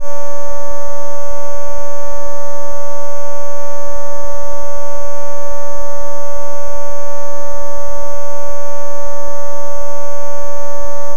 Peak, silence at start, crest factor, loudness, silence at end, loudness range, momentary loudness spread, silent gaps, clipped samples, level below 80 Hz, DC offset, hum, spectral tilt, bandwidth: 0 dBFS; 0 s; 22 dB; -26 LUFS; 0 s; 0 LU; 0 LU; none; 0.2%; -40 dBFS; 90%; none; -5.5 dB/octave; 16 kHz